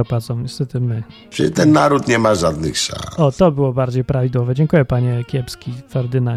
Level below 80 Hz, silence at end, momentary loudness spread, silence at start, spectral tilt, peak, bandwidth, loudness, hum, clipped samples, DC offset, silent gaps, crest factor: -40 dBFS; 0 s; 10 LU; 0 s; -6 dB/octave; 0 dBFS; 13.5 kHz; -17 LUFS; none; under 0.1%; under 0.1%; none; 16 dB